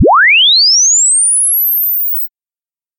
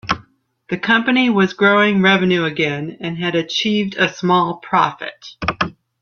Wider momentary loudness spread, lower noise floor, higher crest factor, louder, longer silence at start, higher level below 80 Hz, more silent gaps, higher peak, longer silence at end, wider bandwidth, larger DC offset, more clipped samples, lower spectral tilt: second, 8 LU vs 11 LU; first, under -90 dBFS vs -51 dBFS; second, 8 dB vs 16 dB; first, -6 LUFS vs -17 LUFS; about the same, 0 s vs 0.05 s; about the same, -52 dBFS vs -50 dBFS; neither; about the same, -2 dBFS vs -2 dBFS; first, 0.7 s vs 0.3 s; first, 17 kHz vs 7 kHz; neither; neither; second, -0.5 dB/octave vs -5.5 dB/octave